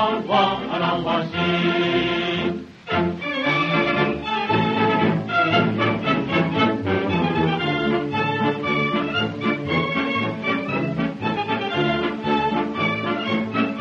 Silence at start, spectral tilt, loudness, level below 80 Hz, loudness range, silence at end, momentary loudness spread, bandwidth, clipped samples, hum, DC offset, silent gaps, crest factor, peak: 0 s; -7 dB/octave; -21 LUFS; -50 dBFS; 3 LU; 0 s; 5 LU; 7.2 kHz; under 0.1%; none; under 0.1%; none; 16 dB; -4 dBFS